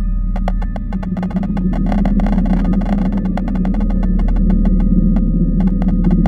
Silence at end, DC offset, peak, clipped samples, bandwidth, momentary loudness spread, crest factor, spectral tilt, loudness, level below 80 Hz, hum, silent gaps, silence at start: 0 s; under 0.1%; -2 dBFS; under 0.1%; 4.3 kHz; 6 LU; 12 dB; -10 dB/octave; -17 LUFS; -16 dBFS; none; none; 0 s